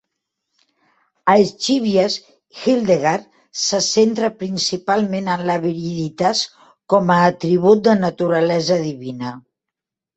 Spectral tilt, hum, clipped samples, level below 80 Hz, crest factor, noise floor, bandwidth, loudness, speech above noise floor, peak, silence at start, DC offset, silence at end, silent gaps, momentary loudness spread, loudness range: -4.5 dB/octave; none; under 0.1%; -60 dBFS; 18 dB; -85 dBFS; 8.4 kHz; -18 LUFS; 68 dB; 0 dBFS; 1.25 s; under 0.1%; 0.75 s; none; 11 LU; 2 LU